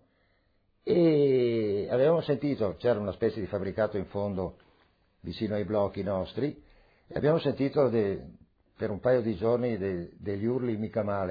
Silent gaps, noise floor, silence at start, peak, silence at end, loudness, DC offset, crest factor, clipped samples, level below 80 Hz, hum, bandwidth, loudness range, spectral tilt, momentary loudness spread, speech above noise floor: none; -70 dBFS; 0.85 s; -14 dBFS; 0 s; -29 LUFS; under 0.1%; 16 dB; under 0.1%; -58 dBFS; none; 5 kHz; 6 LU; -10 dB/octave; 11 LU; 41 dB